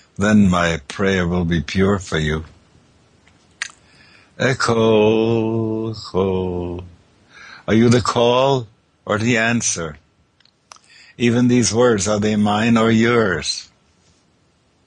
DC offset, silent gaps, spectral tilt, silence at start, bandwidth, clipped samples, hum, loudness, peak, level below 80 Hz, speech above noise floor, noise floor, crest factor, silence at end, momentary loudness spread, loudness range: under 0.1%; none; -5 dB/octave; 0.2 s; 10.5 kHz; under 0.1%; none; -17 LUFS; -4 dBFS; -44 dBFS; 43 dB; -59 dBFS; 16 dB; 1.25 s; 12 LU; 5 LU